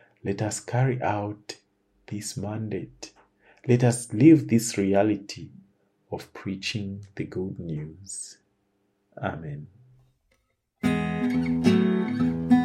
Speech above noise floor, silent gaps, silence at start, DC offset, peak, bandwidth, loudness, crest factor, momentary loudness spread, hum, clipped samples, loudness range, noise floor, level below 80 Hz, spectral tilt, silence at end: 46 dB; none; 0.25 s; under 0.1%; -4 dBFS; 14 kHz; -25 LUFS; 22 dB; 18 LU; none; under 0.1%; 13 LU; -71 dBFS; -56 dBFS; -6 dB/octave; 0 s